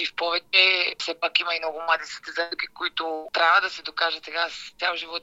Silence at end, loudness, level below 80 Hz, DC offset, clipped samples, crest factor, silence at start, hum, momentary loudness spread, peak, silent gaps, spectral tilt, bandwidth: 0 s; -23 LUFS; -68 dBFS; under 0.1%; under 0.1%; 24 dB; 0 s; none; 11 LU; -2 dBFS; none; 0 dB/octave; 16 kHz